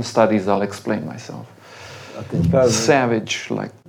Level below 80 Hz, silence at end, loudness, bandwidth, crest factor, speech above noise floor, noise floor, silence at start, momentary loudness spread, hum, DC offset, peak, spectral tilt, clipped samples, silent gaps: -56 dBFS; 0.15 s; -19 LUFS; 19 kHz; 18 dB; 19 dB; -39 dBFS; 0 s; 21 LU; none; under 0.1%; -2 dBFS; -5 dB/octave; under 0.1%; none